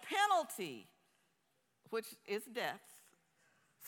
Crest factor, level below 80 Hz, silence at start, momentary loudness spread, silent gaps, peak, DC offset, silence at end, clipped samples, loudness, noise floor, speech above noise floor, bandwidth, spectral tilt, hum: 22 dB; under -90 dBFS; 0 s; 14 LU; none; -20 dBFS; under 0.1%; 0 s; under 0.1%; -39 LUFS; -81 dBFS; 37 dB; 18 kHz; -2 dB/octave; none